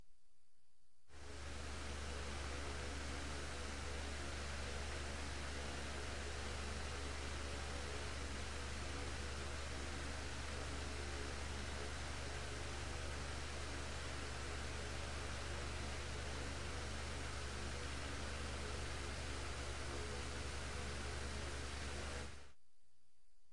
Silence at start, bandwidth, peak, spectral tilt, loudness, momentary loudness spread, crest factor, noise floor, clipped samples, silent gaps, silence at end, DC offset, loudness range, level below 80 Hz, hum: 0.05 s; 11.5 kHz; -32 dBFS; -3.5 dB/octave; -47 LUFS; 1 LU; 14 dB; -79 dBFS; under 0.1%; none; 1 s; 0.3%; 1 LU; -50 dBFS; none